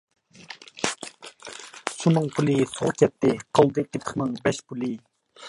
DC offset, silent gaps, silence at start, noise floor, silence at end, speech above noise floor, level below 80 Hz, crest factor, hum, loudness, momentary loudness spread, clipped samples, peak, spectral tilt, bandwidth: under 0.1%; none; 0.4 s; -46 dBFS; 0 s; 23 dB; -62 dBFS; 22 dB; none; -24 LUFS; 19 LU; under 0.1%; -4 dBFS; -5.5 dB/octave; 11.5 kHz